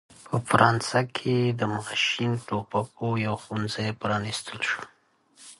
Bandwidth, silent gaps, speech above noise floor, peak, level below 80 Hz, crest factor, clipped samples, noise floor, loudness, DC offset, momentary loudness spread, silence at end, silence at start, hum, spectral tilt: 11.5 kHz; none; 36 dB; -2 dBFS; -60 dBFS; 24 dB; under 0.1%; -62 dBFS; -26 LUFS; under 0.1%; 10 LU; 0.05 s; 0.1 s; none; -5 dB/octave